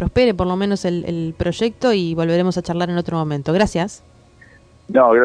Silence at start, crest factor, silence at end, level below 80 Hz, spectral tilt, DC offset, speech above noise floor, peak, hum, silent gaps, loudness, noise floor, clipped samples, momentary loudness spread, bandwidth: 0 s; 18 dB; 0 s; -40 dBFS; -6.5 dB/octave; under 0.1%; 30 dB; -2 dBFS; none; none; -19 LUFS; -48 dBFS; under 0.1%; 6 LU; 10.5 kHz